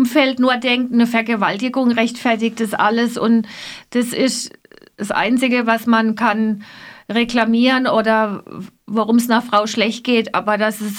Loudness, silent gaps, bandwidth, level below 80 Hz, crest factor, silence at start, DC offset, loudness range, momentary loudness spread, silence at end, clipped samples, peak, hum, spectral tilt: -17 LUFS; none; 16.5 kHz; -58 dBFS; 16 dB; 0 s; under 0.1%; 2 LU; 9 LU; 0 s; under 0.1%; -2 dBFS; none; -4 dB/octave